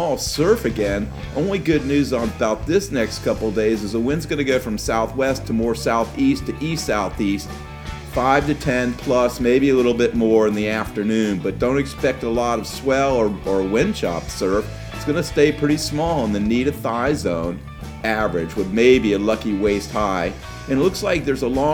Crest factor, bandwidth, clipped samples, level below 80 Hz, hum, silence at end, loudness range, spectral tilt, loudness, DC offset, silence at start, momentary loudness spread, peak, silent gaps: 18 dB; 18.5 kHz; under 0.1%; -36 dBFS; none; 0 s; 3 LU; -5.5 dB/octave; -20 LUFS; under 0.1%; 0 s; 7 LU; -2 dBFS; none